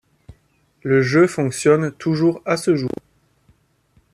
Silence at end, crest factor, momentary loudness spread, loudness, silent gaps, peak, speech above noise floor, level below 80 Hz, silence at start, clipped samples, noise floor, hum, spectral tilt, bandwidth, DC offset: 1.25 s; 18 dB; 10 LU; -18 LUFS; none; -2 dBFS; 43 dB; -58 dBFS; 0.85 s; under 0.1%; -60 dBFS; none; -6 dB/octave; 13.5 kHz; under 0.1%